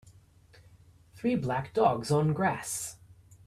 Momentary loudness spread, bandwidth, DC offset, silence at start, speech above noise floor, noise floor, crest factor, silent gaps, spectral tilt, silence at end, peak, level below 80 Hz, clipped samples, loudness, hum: 9 LU; 15.5 kHz; under 0.1%; 1.15 s; 30 dB; -58 dBFS; 20 dB; none; -5.5 dB/octave; 0.5 s; -10 dBFS; -62 dBFS; under 0.1%; -29 LUFS; none